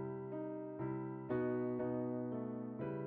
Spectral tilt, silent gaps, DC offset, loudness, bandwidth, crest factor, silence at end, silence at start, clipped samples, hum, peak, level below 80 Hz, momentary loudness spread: -9.5 dB/octave; none; under 0.1%; -42 LUFS; 3.7 kHz; 14 dB; 0 s; 0 s; under 0.1%; none; -28 dBFS; -74 dBFS; 6 LU